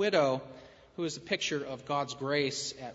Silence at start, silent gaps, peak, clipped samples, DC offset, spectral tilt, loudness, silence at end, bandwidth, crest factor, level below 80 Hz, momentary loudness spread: 0 s; none; -14 dBFS; under 0.1%; under 0.1%; -3.5 dB/octave; -32 LUFS; 0 s; 8 kHz; 20 dB; -68 dBFS; 14 LU